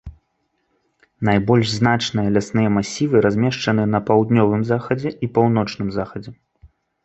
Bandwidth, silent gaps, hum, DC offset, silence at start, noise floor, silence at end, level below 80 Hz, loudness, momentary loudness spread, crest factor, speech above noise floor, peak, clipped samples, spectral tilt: 8.2 kHz; none; none; under 0.1%; 0.05 s; -69 dBFS; 0.7 s; -48 dBFS; -19 LUFS; 8 LU; 18 dB; 51 dB; -2 dBFS; under 0.1%; -6.5 dB/octave